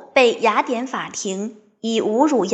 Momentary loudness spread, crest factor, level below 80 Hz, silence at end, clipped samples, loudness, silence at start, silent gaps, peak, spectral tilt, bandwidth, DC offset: 13 LU; 18 dB; -76 dBFS; 0 s; under 0.1%; -20 LUFS; 0 s; none; -2 dBFS; -3.5 dB/octave; 8.6 kHz; under 0.1%